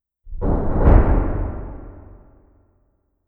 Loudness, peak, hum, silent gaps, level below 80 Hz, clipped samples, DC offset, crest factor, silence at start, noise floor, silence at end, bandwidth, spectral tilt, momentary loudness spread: -20 LUFS; 0 dBFS; none; none; -22 dBFS; under 0.1%; under 0.1%; 20 dB; 0.25 s; -65 dBFS; 1.25 s; 3 kHz; -12 dB/octave; 25 LU